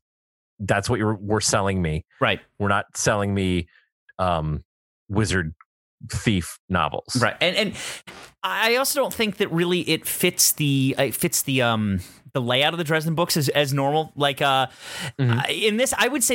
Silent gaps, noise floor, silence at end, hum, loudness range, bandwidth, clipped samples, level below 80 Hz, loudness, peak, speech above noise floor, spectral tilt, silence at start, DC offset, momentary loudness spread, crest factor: 3.92-4.07 s, 4.65-5.06 s, 5.66-5.98 s, 6.59-6.68 s; under -90 dBFS; 0 s; none; 5 LU; 17 kHz; under 0.1%; -48 dBFS; -22 LUFS; -4 dBFS; over 68 dB; -4 dB/octave; 0.6 s; under 0.1%; 9 LU; 20 dB